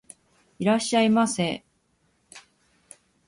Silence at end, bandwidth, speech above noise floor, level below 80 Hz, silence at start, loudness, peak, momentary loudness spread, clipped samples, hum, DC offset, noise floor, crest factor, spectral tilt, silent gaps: 0.9 s; 11.5 kHz; 46 dB; -66 dBFS; 0.6 s; -23 LUFS; -10 dBFS; 8 LU; under 0.1%; none; under 0.1%; -68 dBFS; 18 dB; -4.5 dB/octave; none